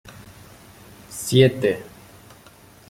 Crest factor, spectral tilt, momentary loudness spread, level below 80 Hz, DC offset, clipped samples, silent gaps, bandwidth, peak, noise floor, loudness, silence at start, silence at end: 22 dB; -5.5 dB/octave; 27 LU; -56 dBFS; under 0.1%; under 0.1%; none; 16.5 kHz; -2 dBFS; -49 dBFS; -20 LUFS; 0.05 s; 1 s